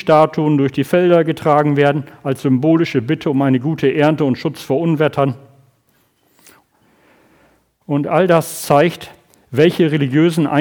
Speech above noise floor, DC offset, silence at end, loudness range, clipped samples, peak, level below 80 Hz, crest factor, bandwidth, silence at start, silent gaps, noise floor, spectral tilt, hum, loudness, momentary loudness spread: 45 dB; under 0.1%; 0 s; 7 LU; under 0.1%; 0 dBFS; -58 dBFS; 16 dB; 20 kHz; 0.05 s; none; -59 dBFS; -7 dB/octave; none; -15 LUFS; 8 LU